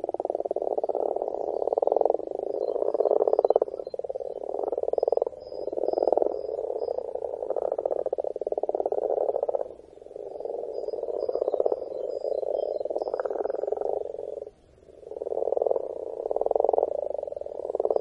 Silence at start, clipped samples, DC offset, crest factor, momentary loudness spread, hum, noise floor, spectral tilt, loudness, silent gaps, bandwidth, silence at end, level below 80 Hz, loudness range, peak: 0 s; under 0.1%; under 0.1%; 24 dB; 11 LU; none; -53 dBFS; -7.5 dB/octave; -29 LUFS; none; 5.6 kHz; 0 s; -66 dBFS; 5 LU; -4 dBFS